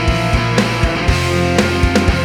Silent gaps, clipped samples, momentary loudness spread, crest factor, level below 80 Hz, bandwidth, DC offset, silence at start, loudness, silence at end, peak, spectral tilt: none; under 0.1%; 2 LU; 14 dB; -22 dBFS; 16 kHz; under 0.1%; 0 s; -15 LUFS; 0 s; 0 dBFS; -5.5 dB/octave